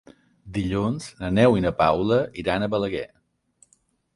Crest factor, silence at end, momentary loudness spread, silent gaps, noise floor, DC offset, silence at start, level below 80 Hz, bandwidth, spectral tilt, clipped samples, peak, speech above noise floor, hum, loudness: 18 dB; 1.1 s; 12 LU; none; -65 dBFS; under 0.1%; 0.45 s; -46 dBFS; 11.5 kHz; -7 dB/octave; under 0.1%; -6 dBFS; 43 dB; none; -23 LUFS